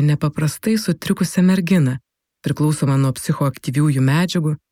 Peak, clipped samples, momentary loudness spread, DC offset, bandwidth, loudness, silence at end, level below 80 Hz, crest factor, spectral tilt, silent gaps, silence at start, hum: -4 dBFS; under 0.1%; 5 LU; under 0.1%; 16 kHz; -18 LUFS; 0.15 s; -54 dBFS; 14 dB; -6.5 dB/octave; none; 0 s; none